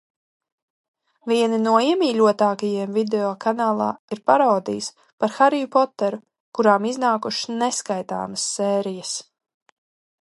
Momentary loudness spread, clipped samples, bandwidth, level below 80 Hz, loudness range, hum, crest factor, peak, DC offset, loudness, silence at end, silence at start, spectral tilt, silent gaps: 10 LU; under 0.1%; 11.5 kHz; -72 dBFS; 3 LU; none; 20 dB; 0 dBFS; under 0.1%; -21 LUFS; 1 s; 1.25 s; -4 dB/octave; 3.99-4.08 s, 5.13-5.18 s, 6.40-6.52 s